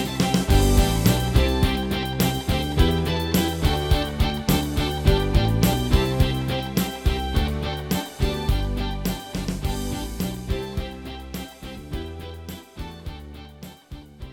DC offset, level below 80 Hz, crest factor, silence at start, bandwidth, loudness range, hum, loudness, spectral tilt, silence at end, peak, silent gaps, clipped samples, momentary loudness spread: under 0.1%; -28 dBFS; 18 dB; 0 s; 19.5 kHz; 11 LU; none; -23 LUFS; -5.5 dB/octave; 0 s; -4 dBFS; none; under 0.1%; 18 LU